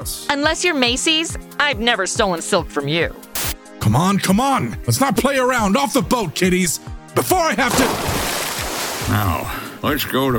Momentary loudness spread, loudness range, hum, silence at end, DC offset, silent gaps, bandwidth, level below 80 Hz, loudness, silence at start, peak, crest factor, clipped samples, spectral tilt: 7 LU; 2 LU; none; 0 s; under 0.1%; none; over 20 kHz; -36 dBFS; -18 LUFS; 0 s; -4 dBFS; 16 dB; under 0.1%; -4 dB/octave